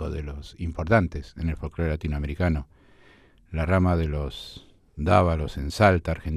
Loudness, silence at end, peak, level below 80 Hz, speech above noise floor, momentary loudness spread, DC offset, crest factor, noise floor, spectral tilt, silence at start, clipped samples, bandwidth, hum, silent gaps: -25 LUFS; 0 s; -4 dBFS; -36 dBFS; 31 dB; 14 LU; under 0.1%; 20 dB; -55 dBFS; -7.5 dB/octave; 0 s; under 0.1%; 13 kHz; none; none